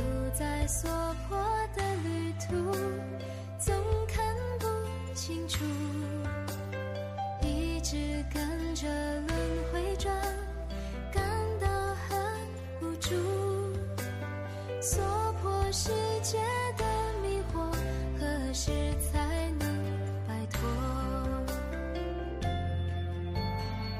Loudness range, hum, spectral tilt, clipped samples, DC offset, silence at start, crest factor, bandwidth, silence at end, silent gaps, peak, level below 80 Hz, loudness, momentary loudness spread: 3 LU; none; -5 dB/octave; under 0.1%; under 0.1%; 0 s; 14 dB; 15 kHz; 0 s; none; -18 dBFS; -38 dBFS; -33 LUFS; 6 LU